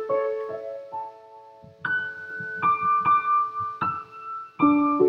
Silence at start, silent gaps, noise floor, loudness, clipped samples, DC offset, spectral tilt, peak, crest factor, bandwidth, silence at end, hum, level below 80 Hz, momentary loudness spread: 0 s; none; -48 dBFS; -25 LUFS; under 0.1%; under 0.1%; -8 dB/octave; -8 dBFS; 18 dB; 5.6 kHz; 0 s; none; -72 dBFS; 15 LU